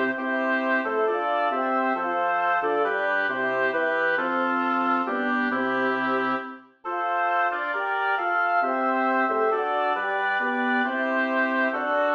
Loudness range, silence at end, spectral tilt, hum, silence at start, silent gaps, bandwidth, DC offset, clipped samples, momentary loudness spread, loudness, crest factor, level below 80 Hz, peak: 1 LU; 0 s; -5.5 dB/octave; none; 0 s; none; 6.8 kHz; under 0.1%; under 0.1%; 2 LU; -24 LUFS; 12 dB; -72 dBFS; -12 dBFS